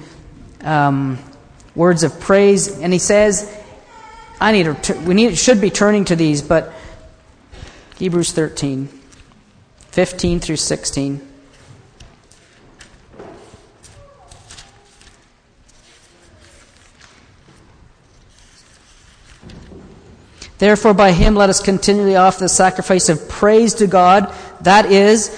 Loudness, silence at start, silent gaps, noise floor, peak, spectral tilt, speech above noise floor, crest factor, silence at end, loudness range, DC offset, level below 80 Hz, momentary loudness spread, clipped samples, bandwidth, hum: -14 LUFS; 0.6 s; none; -51 dBFS; 0 dBFS; -4.5 dB/octave; 38 dB; 16 dB; 0 s; 11 LU; under 0.1%; -34 dBFS; 12 LU; under 0.1%; 10.5 kHz; none